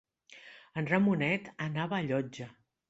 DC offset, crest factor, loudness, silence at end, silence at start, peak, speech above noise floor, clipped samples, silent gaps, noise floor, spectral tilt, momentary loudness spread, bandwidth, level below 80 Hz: under 0.1%; 20 dB; -32 LUFS; 0.4 s; 0.3 s; -12 dBFS; 24 dB; under 0.1%; none; -55 dBFS; -7 dB/octave; 22 LU; 8 kHz; -70 dBFS